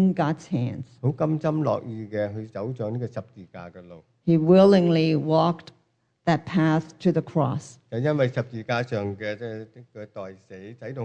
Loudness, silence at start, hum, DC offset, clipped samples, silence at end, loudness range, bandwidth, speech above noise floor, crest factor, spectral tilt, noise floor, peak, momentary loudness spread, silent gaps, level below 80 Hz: -24 LUFS; 0 s; none; under 0.1%; under 0.1%; 0 s; 8 LU; 8.6 kHz; 42 dB; 20 dB; -8 dB/octave; -66 dBFS; -4 dBFS; 21 LU; none; -66 dBFS